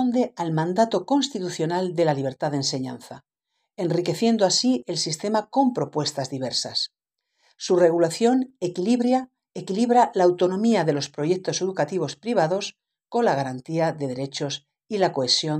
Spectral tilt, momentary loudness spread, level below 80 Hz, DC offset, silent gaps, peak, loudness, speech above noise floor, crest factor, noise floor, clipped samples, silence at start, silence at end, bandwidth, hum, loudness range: -4.5 dB/octave; 10 LU; -72 dBFS; under 0.1%; none; -6 dBFS; -23 LUFS; 55 dB; 18 dB; -78 dBFS; under 0.1%; 0 s; 0 s; 13 kHz; none; 4 LU